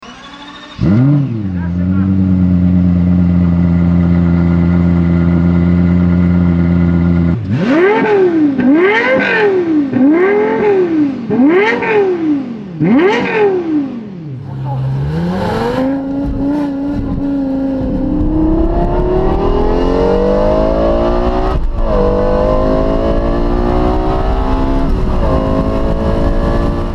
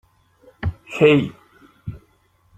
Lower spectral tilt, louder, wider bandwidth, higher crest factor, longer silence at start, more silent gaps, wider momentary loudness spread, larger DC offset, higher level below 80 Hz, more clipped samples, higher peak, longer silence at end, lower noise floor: first, -9 dB/octave vs -7.5 dB/octave; first, -13 LUFS vs -19 LUFS; second, 6.4 kHz vs 8.8 kHz; second, 12 dB vs 20 dB; second, 0 s vs 0.6 s; neither; second, 7 LU vs 22 LU; neither; first, -20 dBFS vs -46 dBFS; neither; about the same, 0 dBFS vs -2 dBFS; second, 0 s vs 0.6 s; second, -31 dBFS vs -60 dBFS